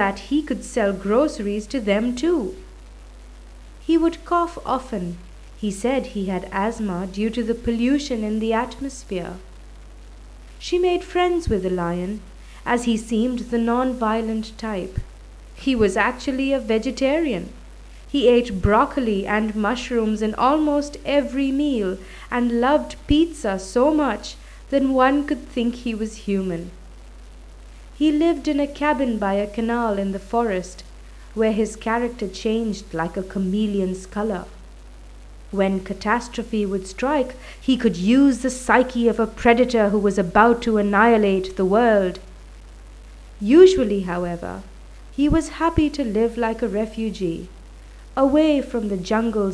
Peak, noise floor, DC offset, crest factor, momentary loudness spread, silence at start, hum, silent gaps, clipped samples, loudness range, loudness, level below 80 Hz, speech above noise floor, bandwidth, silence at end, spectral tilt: 0 dBFS; -41 dBFS; under 0.1%; 20 dB; 12 LU; 0 s; none; none; under 0.1%; 7 LU; -21 LUFS; -38 dBFS; 20 dB; 11 kHz; 0 s; -6 dB/octave